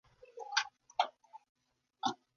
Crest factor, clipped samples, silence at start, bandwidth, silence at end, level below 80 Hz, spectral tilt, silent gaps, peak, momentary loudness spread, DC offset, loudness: 26 dB; under 0.1%; 0.35 s; 7.2 kHz; 0.2 s; -84 dBFS; -1 dB/octave; 1.49-1.55 s; -16 dBFS; 12 LU; under 0.1%; -38 LUFS